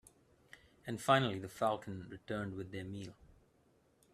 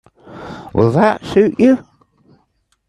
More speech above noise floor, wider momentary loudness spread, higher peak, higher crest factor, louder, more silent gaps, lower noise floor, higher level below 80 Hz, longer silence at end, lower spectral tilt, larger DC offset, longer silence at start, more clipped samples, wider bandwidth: second, 34 dB vs 50 dB; second, 17 LU vs 20 LU; second, -16 dBFS vs 0 dBFS; first, 24 dB vs 16 dB; second, -38 LUFS vs -14 LUFS; neither; first, -72 dBFS vs -63 dBFS; second, -70 dBFS vs -48 dBFS; about the same, 1 s vs 1.05 s; second, -5.5 dB/octave vs -8 dB/octave; neither; first, 0.55 s vs 0.3 s; neither; first, 14.5 kHz vs 10.5 kHz